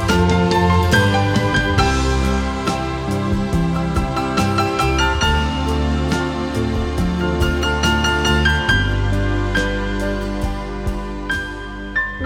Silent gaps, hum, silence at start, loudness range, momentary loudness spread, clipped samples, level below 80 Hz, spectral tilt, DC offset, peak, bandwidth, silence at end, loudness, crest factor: none; none; 0 s; 2 LU; 8 LU; under 0.1%; -24 dBFS; -5.5 dB/octave; under 0.1%; -2 dBFS; 16.5 kHz; 0 s; -18 LUFS; 16 dB